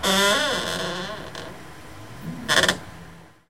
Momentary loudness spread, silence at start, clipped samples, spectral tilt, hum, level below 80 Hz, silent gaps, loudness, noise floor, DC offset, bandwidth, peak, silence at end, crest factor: 23 LU; 0 s; under 0.1%; -2 dB/octave; none; -52 dBFS; none; -22 LUFS; -45 dBFS; 0.5%; 17 kHz; -4 dBFS; 0 s; 22 dB